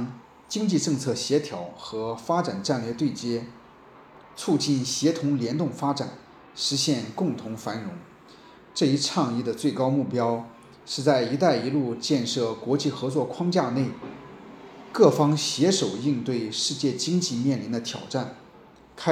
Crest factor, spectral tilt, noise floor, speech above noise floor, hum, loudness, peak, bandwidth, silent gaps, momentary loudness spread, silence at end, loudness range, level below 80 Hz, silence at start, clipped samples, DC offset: 24 dB; -5 dB/octave; -51 dBFS; 26 dB; none; -26 LUFS; -2 dBFS; 14.5 kHz; none; 13 LU; 0 s; 4 LU; -68 dBFS; 0 s; under 0.1%; under 0.1%